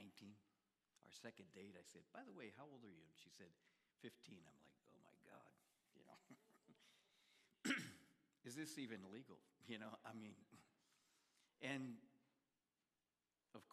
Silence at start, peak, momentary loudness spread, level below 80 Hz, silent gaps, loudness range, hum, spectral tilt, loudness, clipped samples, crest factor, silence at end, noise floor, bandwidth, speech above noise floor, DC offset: 0 s; -32 dBFS; 18 LU; under -90 dBFS; none; 14 LU; none; -3.5 dB/octave; -55 LUFS; under 0.1%; 28 dB; 0 s; under -90 dBFS; 14 kHz; over 32 dB; under 0.1%